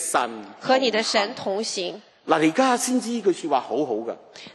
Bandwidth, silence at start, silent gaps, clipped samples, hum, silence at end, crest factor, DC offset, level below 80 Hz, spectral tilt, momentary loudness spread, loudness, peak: 13 kHz; 0 s; none; under 0.1%; none; 0.05 s; 20 dB; under 0.1%; -76 dBFS; -3 dB/octave; 12 LU; -23 LUFS; -4 dBFS